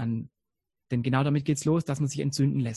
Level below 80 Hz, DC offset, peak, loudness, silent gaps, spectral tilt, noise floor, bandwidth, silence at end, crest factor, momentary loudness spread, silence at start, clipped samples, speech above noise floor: -60 dBFS; under 0.1%; -10 dBFS; -27 LUFS; none; -6.5 dB/octave; -87 dBFS; 12 kHz; 0 s; 18 dB; 8 LU; 0 s; under 0.1%; 61 dB